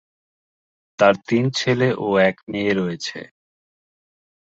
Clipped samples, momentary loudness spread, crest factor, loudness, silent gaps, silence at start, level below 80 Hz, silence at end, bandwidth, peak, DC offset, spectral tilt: under 0.1%; 10 LU; 20 dB; -20 LUFS; 2.43-2.47 s; 1 s; -60 dBFS; 1.3 s; 8 kHz; -2 dBFS; under 0.1%; -5.5 dB/octave